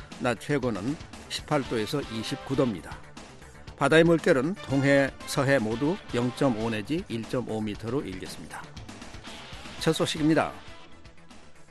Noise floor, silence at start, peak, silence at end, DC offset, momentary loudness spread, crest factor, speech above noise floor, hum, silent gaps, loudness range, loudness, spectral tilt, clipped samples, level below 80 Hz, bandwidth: -47 dBFS; 0 s; -8 dBFS; 0.05 s; under 0.1%; 20 LU; 20 dB; 20 dB; none; none; 7 LU; -27 LUFS; -5.5 dB/octave; under 0.1%; -52 dBFS; 12.5 kHz